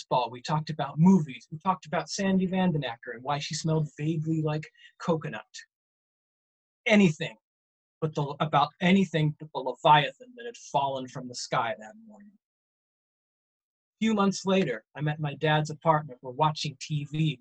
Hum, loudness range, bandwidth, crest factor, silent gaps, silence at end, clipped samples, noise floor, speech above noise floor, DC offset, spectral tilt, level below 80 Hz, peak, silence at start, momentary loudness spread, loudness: none; 7 LU; 8.8 kHz; 22 dB; 5.75-6.84 s, 7.43-8.01 s, 12.45-13.93 s; 0.05 s; under 0.1%; under -90 dBFS; over 63 dB; under 0.1%; -6 dB/octave; -66 dBFS; -8 dBFS; 0 s; 15 LU; -28 LUFS